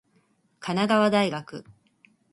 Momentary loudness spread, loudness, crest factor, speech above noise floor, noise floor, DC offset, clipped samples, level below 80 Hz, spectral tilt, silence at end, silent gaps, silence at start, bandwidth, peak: 21 LU; -24 LUFS; 18 dB; 43 dB; -66 dBFS; under 0.1%; under 0.1%; -70 dBFS; -5.5 dB/octave; 0.7 s; none; 0.6 s; 11.5 kHz; -8 dBFS